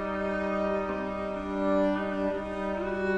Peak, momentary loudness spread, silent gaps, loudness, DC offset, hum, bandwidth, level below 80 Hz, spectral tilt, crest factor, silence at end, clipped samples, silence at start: -16 dBFS; 6 LU; none; -30 LUFS; under 0.1%; none; 9.4 kHz; -50 dBFS; -7.5 dB/octave; 14 dB; 0 s; under 0.1%; 0 s